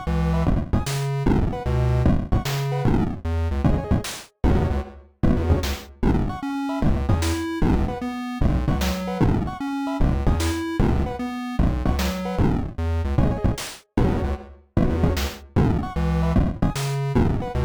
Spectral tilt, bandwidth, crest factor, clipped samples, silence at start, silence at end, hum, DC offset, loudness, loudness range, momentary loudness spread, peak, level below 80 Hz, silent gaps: -6.5 dB/octave; over 20 kHz; 14 dB; under 0.1%; 0 s; 0 s; none; under 0.1%; -24 LUFS; 1 LU; 6 LU; -8 dBFS; -26 dBFS; none